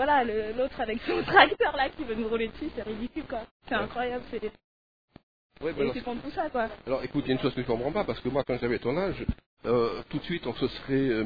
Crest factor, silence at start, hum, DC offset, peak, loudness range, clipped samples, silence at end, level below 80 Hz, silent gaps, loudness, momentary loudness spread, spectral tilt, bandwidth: 26 dB; 0 s; none; 0.3%; -2 dBFS; 7 LU; under 0.1%; 0 s; -50 dBFS; 3.51-3.60 s, 4.64-5.08 s, 5.23-5.50 s, 9.46-9.57 s; -29 LUFS; 11 LU; -8 dB/octave; 5 kHz